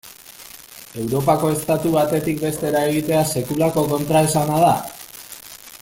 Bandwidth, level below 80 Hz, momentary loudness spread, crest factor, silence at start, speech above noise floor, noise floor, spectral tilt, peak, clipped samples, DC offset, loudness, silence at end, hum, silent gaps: 17 kHz; -50 dBFS; 20 LU; 16 dB; 0.05 s; 23 dB; -41 dBFS; -5.5 dB/octave; -4 dBFS; under 0.1%; under 0.1%; -19 LUFS; 0.05 s; none; none